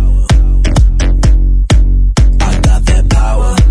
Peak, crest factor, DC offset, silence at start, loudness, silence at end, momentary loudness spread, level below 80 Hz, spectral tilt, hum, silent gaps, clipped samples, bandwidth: 0 dBFS; 6 dB; under 0.1%; 0 s; -11 LUFS; 0 s; 1 LU; -8 dBFS; -6 dB/octave; none; none; under 0.1%; 10.5 kHz